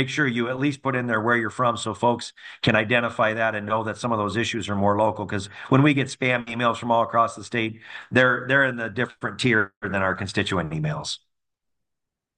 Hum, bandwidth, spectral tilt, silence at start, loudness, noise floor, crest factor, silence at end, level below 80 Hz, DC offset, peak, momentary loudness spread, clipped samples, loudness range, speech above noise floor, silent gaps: none; 10 kHz; -5.5 dB/octave; 0 s; -23 LUFS; -83 dBFS; 20 dB; 1.2 s; -60 dBFS; under 0.1%; -4 dBFS; 8 LU; under 0.1%; 2 LU; 59 dB; 9.76-9.81 s